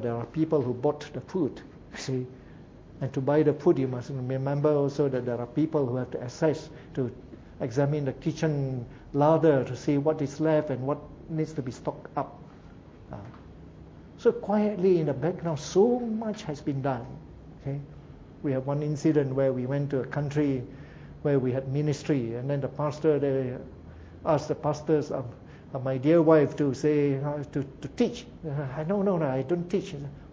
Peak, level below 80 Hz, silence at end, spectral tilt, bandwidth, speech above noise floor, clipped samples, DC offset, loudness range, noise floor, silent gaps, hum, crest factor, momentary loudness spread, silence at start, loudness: -6 dBFS; -54 dBFS; 0 s; -8 dB/octave; 7.8 kHz; 22 dB; under 0.1%; under 0.1%; 5 LU; -48 dBFS; none; none; 22 dB; 17 LU; 0 s; -28 LUFS